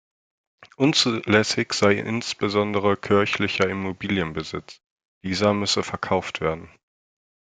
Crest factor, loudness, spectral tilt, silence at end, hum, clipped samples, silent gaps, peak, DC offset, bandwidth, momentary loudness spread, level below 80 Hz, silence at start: 22 dB; -22 LUFS; -4.5 dB/octave; 0.9 s; none; under 0.1%; 4.86-4.96 s, 5.05-5.21 s; -2 dBFS; under 0.1%; 9.4 kHz; 9 LU; -58 dBFS; 0.6 s